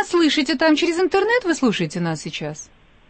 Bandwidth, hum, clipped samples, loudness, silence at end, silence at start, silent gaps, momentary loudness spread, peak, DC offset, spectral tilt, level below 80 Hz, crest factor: 8.8 kHz; none; under 0.1%; -19 LUFS; 0.45 s; 0 s; none; 12 LU; -6 dBFS; under 0.1%; -4.5 dB/octave; -54 dBFS; 14 dB